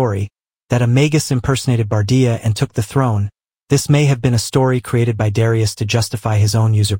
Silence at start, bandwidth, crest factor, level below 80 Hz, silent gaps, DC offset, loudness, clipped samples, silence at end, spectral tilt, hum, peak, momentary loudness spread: 0 s; 17 kHz; 14 dB; -42 dBFS; none; under 0.1%; -16 LUFS; under 0.1%; 0 s; -6 dB/octave; none; 0 dBFS; 5 LU